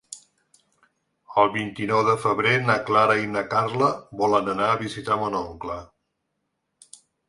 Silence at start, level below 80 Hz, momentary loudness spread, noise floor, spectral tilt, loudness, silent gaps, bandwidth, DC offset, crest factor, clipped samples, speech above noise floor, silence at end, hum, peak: 0.1 s; -58 dBFS; 13 LU; -77 dBFS; -5.5 dB/octave; -22 LUFS; none; 11.5 kHz; under 0.1%; 20 dB; under 0.1%; 55 dB; 1.45 s; none; -4 dBFS